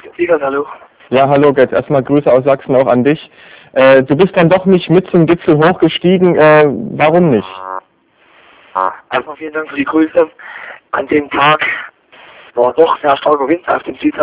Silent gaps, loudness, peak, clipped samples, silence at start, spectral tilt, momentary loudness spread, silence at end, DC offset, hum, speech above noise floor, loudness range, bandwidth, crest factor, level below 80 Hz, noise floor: none; -11 LUFS; 0 dBFS; 0.7%; 0.05 s; -10.5 dB/octave; 13 LU; 0 s; under 0.1%; none; 41 dB; 7 LU; 4 kHz; 12 dB; -50 dBFS; -51 dBFS